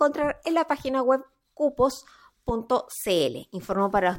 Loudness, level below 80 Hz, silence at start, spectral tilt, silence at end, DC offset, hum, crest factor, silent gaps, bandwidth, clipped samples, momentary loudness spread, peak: -26 LUFS; -50 dBFS; 0 s; -4.5 dB/octave; 0 s; under 0.1%; none; 16 dB; none; 17 kHz; under 0.1%; 8 LU; -8 dBFS